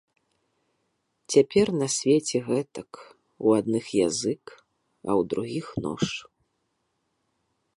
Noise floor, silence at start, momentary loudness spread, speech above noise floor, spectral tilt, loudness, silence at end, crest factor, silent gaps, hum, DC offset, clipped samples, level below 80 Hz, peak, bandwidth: -76 dBFS; 1.3 s; 15 LU; 51 dB; -5 dB/octave; -25 LUFS; 1.55 s; 22 dB; none; none; under 0.1%; under 0.1%; -62 dBFS; -6 dBFS; 11.5 kHz